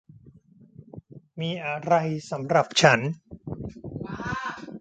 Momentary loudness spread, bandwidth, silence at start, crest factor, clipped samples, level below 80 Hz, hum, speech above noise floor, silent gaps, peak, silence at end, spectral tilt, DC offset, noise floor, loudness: 26 LU; 9.2 kHz; 0.25 s; 26 dB; under 0.1%; -56 dBFS; none; 30 dB; none; -2 dBFS; 0 s; -4.5 dB/octave; under 0.1%; -53 dBFS; -25 LUFS